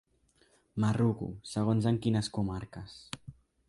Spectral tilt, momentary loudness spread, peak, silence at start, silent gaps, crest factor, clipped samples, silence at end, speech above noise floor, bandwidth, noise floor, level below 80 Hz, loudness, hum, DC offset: -7 dB/octave; 16 LU; -16 dBFS; 0.75 s; none; 18 dB; under 0.1%; 0.35 s; 37 dB; 11.5 kHz; -68 dBFS; -56 dBFS; -32 LUFS; none; under 0.1%